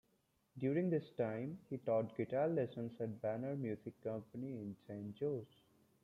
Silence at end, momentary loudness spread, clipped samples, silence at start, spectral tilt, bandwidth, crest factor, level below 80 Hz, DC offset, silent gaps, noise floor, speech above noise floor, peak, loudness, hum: 0.6 s; 11 LU; under 0.1%; 0.55 s; -10 dB/octave; 13 kHz; 16 dB; -80 dBFS; under 0.1%; none; -79 dBFS; 38 dB; -24 dBFS; -42 LUFS; none